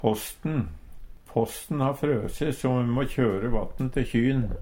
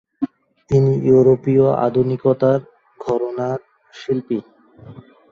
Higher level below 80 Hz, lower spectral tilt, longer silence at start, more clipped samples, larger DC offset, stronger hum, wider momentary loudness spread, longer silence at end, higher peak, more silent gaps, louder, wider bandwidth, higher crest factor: first, -38 dBFS vs -52 dBFS; second, -7 dB/octave vs -9.5 dB/octave; second, 0 s vs 0.2 s; neither; neither; neither; second, 6 LU vs 15 LU; second, 0 s vs 0.3 s; second, -6 dBFS vs -2 dBFS; neither; second, -27 LUFS vs -18 LUFS; first, 17 kHz vs 7 kHz; about the same, 20 dB vs 16 dB